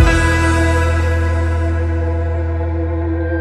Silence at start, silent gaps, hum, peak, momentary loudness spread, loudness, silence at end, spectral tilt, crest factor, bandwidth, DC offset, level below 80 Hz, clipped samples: 0 s; none; none; 0 dBFS; 6 LU; -17 LUFS; 0 s; -6.5 dB/octave; 14 dB; 10.5 kHz; under 0.1%; -22 dBFS; under 0.1%